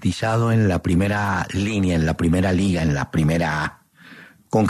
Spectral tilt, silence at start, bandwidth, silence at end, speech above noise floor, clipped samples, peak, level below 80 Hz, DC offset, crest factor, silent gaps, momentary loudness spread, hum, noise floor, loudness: -6.5 dB/octave; 0 s; 13.5 kHz; 0 s; 26 dB; under 0.1%; -6 dBFS; -42 dBFS; under 0.1%; 14 dB; none; 4 LU; none; -45 dBFS; -20 LUFS